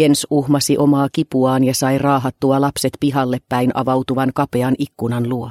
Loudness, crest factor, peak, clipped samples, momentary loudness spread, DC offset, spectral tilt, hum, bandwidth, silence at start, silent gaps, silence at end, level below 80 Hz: -17 LUFS; 14 dB; -2 dBFS; under 0.1%; 5 LU; under 0.1%; -5.5 dB/octave; none; 16 kHz; 0 s; none; 0 s; -52 dBFS